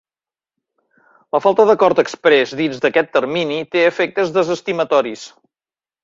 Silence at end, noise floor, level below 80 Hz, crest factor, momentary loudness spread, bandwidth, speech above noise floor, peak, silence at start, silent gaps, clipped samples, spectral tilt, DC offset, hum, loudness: 0.75 s; under -90 dBFS; -62 dBFS; 18 dB; 7 LU; 7.8 kHz; over 74 dB; 0 dBFS; 1.35 s; none; under 0.1%; -5 dB/octave; under 0.1%; none; -16 LUFS